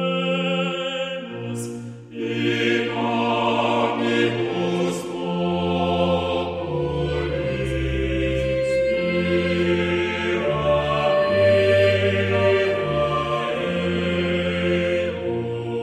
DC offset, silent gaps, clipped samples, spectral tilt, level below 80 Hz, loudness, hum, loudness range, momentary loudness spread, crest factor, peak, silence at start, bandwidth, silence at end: under 0.1%; none; under 0.1%; -6 dB/octave; -40 dBFS; -22 LUFS; none; 4 LU; 8 LU; 16 dB; -6 dBFS; 0 s; 12.5 kHz; 0 s